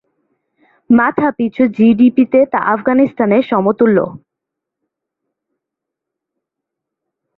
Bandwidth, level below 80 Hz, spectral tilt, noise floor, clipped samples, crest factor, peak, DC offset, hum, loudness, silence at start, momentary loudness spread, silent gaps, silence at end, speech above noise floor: 4.1 kHz; -56 dBFS; -10 dB/octave; -81 dBFS; under 0.1%; 14 dB; -2 dBFS; under 0.1%; none; -13 LUFS; 0.9 s; 5 LU; none; 3.2 s; 69 dB